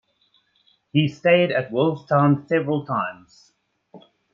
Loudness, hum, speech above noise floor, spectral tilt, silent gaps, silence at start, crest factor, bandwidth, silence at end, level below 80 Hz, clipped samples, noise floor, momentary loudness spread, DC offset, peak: -21 LUFS; none; 44 dB; -8 dB/octave; none; 0.95 s; 18 dB; 7.2 kHz; 0.35 s; -66 dBFS; under 0.1%; -64 dBFS; 8 LU; under 0.1%; -6 dBFS